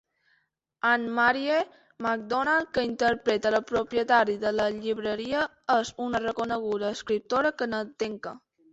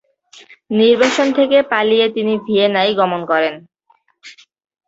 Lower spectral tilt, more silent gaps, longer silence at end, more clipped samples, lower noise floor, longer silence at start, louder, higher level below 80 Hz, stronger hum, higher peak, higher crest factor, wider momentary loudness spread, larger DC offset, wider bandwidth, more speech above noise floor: about the same, -4 dB/octave vs -4.5 dB/octave; neither; second, 0.35 s vs 0.55 s; neither; first, -72 dBFS vs -58 dBFS; first, 0.85 s vs 0.7 s; second, -27 LUFS vs -15 LUFS; about the same, -62 dBFS vs -62 dBFS; neither; second, -8 dBFS vs -2 dBFS; about the same, 18 dB vs 16 dB; about the same, 8 LU vs 7 LU; neither; about the same, 8.2 kHz vs 8 kHz; about the same, 45 dB vs 44 dB